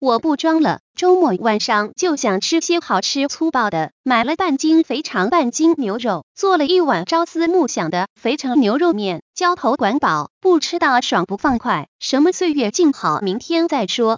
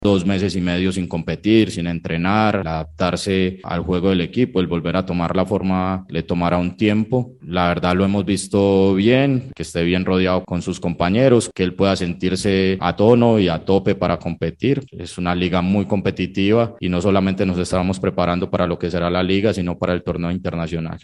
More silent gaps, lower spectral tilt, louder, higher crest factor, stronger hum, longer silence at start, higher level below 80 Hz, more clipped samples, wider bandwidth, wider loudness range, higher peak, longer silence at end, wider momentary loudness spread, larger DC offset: first, 0.80-0.94 s, 3.92-4.04 s, 6.23-6.35 s, 8.10-8.16 s, 9.22-9.34 s, 10.30-10.41 s, 11.88-11.99 s vs none; second, -4 dB/octave vs -6.5 dB/octave; about the same, -17 LUFS vs -19 LUFS; about the same, 14 dB vs 18 dB; neither; about the same, 0 s vs 0 s; second, -56 dBFS vs -42 dBFS; neither; second, 7.6 kHz vs 11.5 kHz; about the same, 1 LU vs 3 LU; about the same, -2 dBFS vs 0 dBFS; about the same, 0 s vs 0.05 s; about the same, 6 LU vs 8 LU; neither